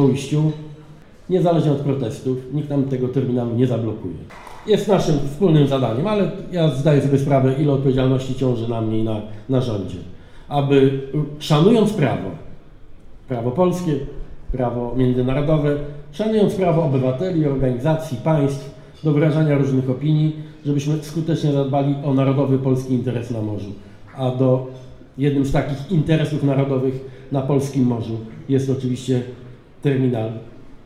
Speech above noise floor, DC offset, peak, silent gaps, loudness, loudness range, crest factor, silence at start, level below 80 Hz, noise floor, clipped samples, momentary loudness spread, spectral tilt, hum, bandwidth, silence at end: 24 dB; under 0.1%; 0 dBFS; none; -20 LUFS; 3 LU; 18 dB; 0 s; -40 dBFS; -42 dBFS; under 0.1%; 12 LU; -8 dB/octave; none; 12.5 kHz; 0.1 s